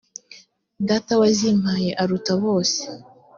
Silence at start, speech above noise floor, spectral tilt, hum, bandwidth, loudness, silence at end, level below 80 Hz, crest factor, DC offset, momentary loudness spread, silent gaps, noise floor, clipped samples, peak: 0.3 s; 29 dB; -5 dB/octave; none; 7.4 kHz; -20 LUFS; 0.35 s; -58 dBFS; 16 dB; under 0.1%; 19 LU; none; -49 dBFS; under 0.1%; -6 dBFS